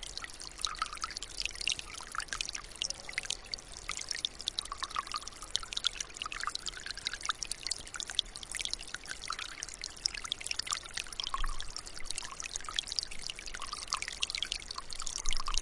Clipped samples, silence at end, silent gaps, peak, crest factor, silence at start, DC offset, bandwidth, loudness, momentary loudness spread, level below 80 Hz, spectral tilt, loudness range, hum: under 0.1%; 0 s; none; -10 dBFS; 28 dB; 0 s; under 0.1%; 11.5 kHz; -37 LUFS; 6 LU; -48 dBFS; 0.5 dB/octave; 1 LU; none